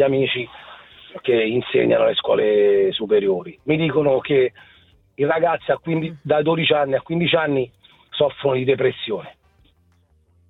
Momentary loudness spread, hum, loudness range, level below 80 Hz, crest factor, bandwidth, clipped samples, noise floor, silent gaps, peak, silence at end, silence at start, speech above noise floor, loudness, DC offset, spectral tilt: 10 LU; none; 3 LU; -58 dBFS; 16 dB; 4.1 kHz; under 0.1%; -59 dBFS; none; -4 dBFS; 1.2 s; 0 s; 40 dB; -19 LUFS; under 0.1%; -9 dB/octave